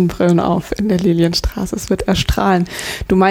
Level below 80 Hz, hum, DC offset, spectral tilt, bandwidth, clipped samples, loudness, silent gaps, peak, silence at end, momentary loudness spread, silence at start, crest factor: -28 dBFS; none; under 0.1%; -5.5 dB/octave; 16.5 kHz; under 0.1%; -16 LUFS; none; -2 dBFS; 0 s; 8 LU; 0 s; 12 dB